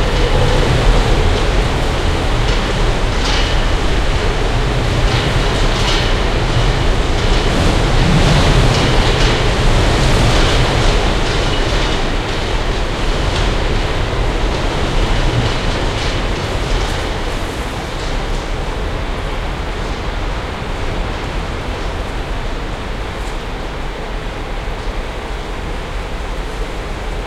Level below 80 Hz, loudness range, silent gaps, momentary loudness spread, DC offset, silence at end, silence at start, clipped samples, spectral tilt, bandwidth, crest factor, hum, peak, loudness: -18 dBFS; 10 LU; none; 11 LU; under 0.1%; 0 s; 0 s; under 0.1%; -5 dB/octave; 12.5 kHz; 14 dB; none; -2 dBFS; -17 LUFS